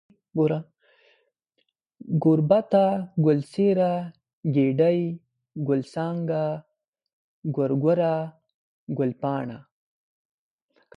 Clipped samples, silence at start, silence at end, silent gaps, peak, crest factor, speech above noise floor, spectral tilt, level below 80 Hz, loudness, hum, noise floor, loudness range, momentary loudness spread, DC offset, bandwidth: under 0.1%; 0.35 s; 1.35 s; 4.33-4.43 s, 6.88-6.93 s, 7.13-7.42 s, 8.54-8.87 s; -6 dBFS; 20 dB; 52 dB; -9.5 dB/octave; -68 dBFS; -24 LUFS; none; -75 dBFS; 5 LU; 14 LU; under 0.1%; 10.5 kHz